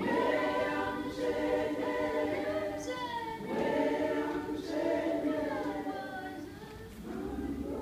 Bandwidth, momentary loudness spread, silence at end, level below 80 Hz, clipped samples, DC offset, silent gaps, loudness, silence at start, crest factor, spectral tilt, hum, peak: 15.5 kHz; 10 LU; 0 s; -56 dBFS; under 0.1%; under 0.1%; none; -34 LUFS; 0 s; 16 dB; -5.5 dB/octave; none; -18 dBFS